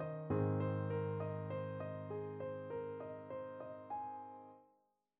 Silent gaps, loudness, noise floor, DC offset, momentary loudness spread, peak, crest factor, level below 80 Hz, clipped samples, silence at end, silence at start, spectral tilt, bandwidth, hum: none; -43 LUFS; -79 dBFS; under 0.1%; 12 LU; -26 dBFS; 16 dB; -74 dBFS; under 0.1%; 0.55 s; 0 s; -8.5 dB/octave; 4 kHz; none